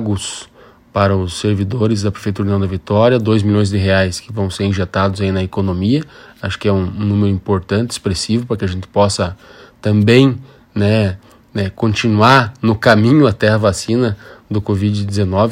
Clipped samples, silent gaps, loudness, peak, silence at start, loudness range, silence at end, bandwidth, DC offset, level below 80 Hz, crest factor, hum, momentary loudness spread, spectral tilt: under 0.1%; none; -15 LUFS; 0 dBFS; 0 s; 4 LU; 0 s; 12 kHz; under 0.1%; -42 dBFS; 14 dB; none; 11 LU; -6 dB/octave